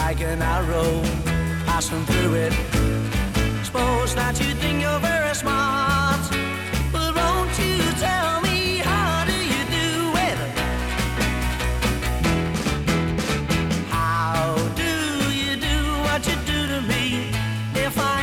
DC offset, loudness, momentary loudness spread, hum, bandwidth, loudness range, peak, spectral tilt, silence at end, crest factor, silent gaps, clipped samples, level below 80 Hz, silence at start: under 0.1%; -22 LUFS; 3 LU; none; 19 kHz; 2 LU; -6 dBFS; -4.5 dB/octave; 0 s; 14 dB; none; under 0.1%; -30 dBFS; 0 s